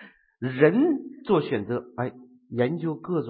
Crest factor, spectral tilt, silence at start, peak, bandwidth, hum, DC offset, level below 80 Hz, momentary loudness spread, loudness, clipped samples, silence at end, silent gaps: 20 dB; -11.5 dB/octave; 0 s; -4 dBFS; 4.8 kHz; none; under 0.1%; -64 dBFS; 13 LU; -26 LUFS; under 0.1%; 0 s; none